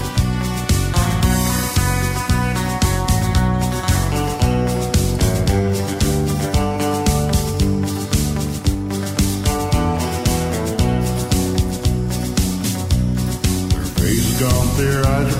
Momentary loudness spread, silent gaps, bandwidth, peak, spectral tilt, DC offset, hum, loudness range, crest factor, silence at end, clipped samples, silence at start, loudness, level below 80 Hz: 3 LU; none; 16.5 kHz; -4 dBFS; -5 dB/octave; under 0.1%; none; 1 LU; 14 dB; 0 s; under 0.1%; 0 s; -18 LUFS; -24 dBFS